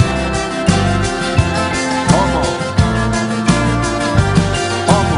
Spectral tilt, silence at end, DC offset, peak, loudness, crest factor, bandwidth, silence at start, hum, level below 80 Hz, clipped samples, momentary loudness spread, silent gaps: -5 dB/octave; 0 s; under 0.1%; 0 dBFS; -15 LUFS; 14 dB; 11 kHz; 0 s; none; -26 dBFS; under 0.1%; 3 LU; none